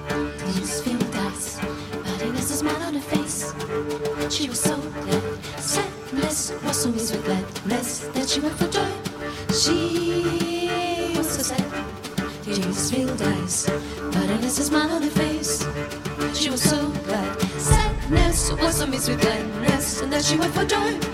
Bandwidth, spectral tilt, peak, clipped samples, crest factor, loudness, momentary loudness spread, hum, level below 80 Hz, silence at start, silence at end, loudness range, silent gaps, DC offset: 16 kHz; -4 dB/octave; -4 dBFS; under 0.1%; 20 dB; -24 LUFS; 8 LU; none; -36 dBFS; 0 s; 0 s; 4 LU; none; under 0.1%